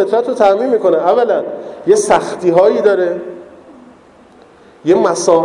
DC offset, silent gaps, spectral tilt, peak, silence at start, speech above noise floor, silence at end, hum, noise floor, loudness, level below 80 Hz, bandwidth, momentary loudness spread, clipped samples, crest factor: under 0.1%; none; -4.5 dB/octave; 0 dBFS; 0 s; 31 dB; 0 s; none; -43 dBFS; -13 LUFS; -56 dBFS; 11.5 kHz; 12 LU; under 0.1%; 14 dB